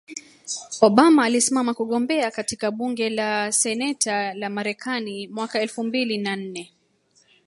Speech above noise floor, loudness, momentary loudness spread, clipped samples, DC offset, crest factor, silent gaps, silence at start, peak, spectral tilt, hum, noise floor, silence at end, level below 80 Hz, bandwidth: 41 dB; -22 LUFS; 15 LU; under 0.1%; under 0.1%; 22 dB; none; 0.1 s; 0 dBFS; -3 dB/octave; none; -62 dBFS; 0.8 s; -68 dBFS; 12 kHz